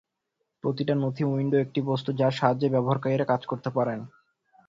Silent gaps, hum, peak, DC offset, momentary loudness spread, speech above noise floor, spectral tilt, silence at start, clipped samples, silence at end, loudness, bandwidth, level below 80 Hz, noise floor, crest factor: none; none; -6 dBFS; under 0.1%; 7 LU; 55 dB; -8.5 dB/octave; 0.65 s; under 0.1%; 0.6 s; -26 LUFS; 7.6 kHz; -66 dBFS; -80 dBFS; 20 dB